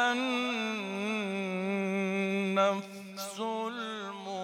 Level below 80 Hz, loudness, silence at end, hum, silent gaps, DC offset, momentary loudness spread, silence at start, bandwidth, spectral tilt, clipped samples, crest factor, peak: under -90 dBFS; -32 LUFS; 0 s; none; none; under 0.1%; 10 LU; 0 s; 16.5 kHz; -5 dB/octave; under 0.1%; 18 dB; -14 dBFS